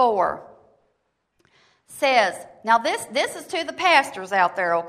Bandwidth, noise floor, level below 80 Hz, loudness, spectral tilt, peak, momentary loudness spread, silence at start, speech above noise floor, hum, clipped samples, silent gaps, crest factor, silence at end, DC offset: 15.5 kHz; -72 dBFS; -68 dBFS; -21 LUFS; -2 dB/octave; -2 dBFS; 10 LU; 0 s; 51 dB; none; under 0.1%; none; 20 dB; 0 s; under 0.1%